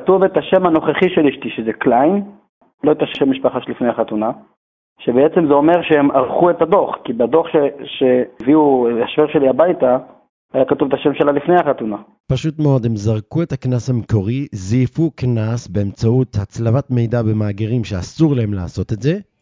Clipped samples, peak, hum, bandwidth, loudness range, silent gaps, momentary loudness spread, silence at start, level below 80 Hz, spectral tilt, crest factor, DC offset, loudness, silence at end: under 0.1%; 0 dBFS; none; 7.6 kHz; 4 LU; 2.49-2.61 s, 2.74-2.78 s, 4.57-4.96 s, 10.29-10.49 s, 12.20-12.24 s; 8 LU; 0 s; -42 dBFS; -8 dB/octave; 14 dB; under 0.1%; -16 LUFS; 0.2 s